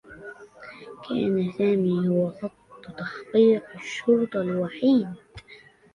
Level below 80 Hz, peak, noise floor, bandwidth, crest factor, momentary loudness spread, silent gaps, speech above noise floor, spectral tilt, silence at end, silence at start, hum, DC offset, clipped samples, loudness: -62 dBFS; -8 dBFS; -51 dBFS; 10.5 kHz; 16 dB; 22 LU; none; 28 dB; -7.5 dB/octave; 0.4 s; 0.1 s; none; under 0.1%; under 0.1%; -24 LUFS